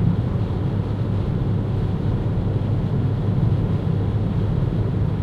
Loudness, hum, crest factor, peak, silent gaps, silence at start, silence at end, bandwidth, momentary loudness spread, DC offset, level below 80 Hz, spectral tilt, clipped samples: -22 LUFS; none; 14 dB; -8 dBFS; none; 0 s; 0 s; 5 kHz; 3 LU; under 0.1%; -30 dBFS; -10 dB/octave; under 0.1%